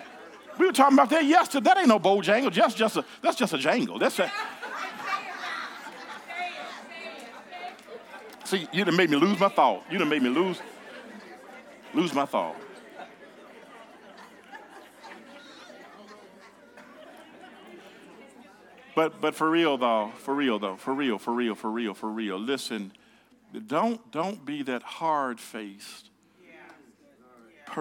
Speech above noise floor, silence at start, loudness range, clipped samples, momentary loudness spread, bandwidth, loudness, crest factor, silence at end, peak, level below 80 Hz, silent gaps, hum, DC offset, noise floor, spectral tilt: 34 dB; 0 s; 24 LU; under 0.1%; 25 LU; 18 kHz; -26 LUFS; 22 dB; 0 s; -6 dBFS; -82 dBFS; none; none; under 0.1%; -59 dBFS; -4.5 dB/octave